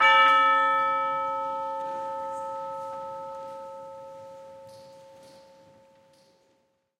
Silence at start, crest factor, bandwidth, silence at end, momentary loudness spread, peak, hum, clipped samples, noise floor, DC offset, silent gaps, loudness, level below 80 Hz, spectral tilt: 0 s; 20 dB; 11.5 kHz; 1.6 s; 26 LU; -8 dBFS; none; under 0.1%; -70 dBFS; under 0.1%; none; -25 LUFS; -78 dBFS; -2 dB/octave